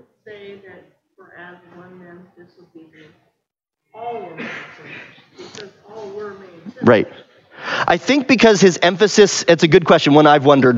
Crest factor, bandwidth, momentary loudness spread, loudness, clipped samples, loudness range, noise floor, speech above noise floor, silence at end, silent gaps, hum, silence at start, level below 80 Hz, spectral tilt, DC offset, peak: 16 dB; 8 kHz; 25 LU; -13 LUFS; under 0.1%; 22 LU; -79 dBFS; 62 dB; 0 s; none; none; 0.3 s; -56 dBFS; -4.5 dB/octave; under 0.1%; 0 dBFS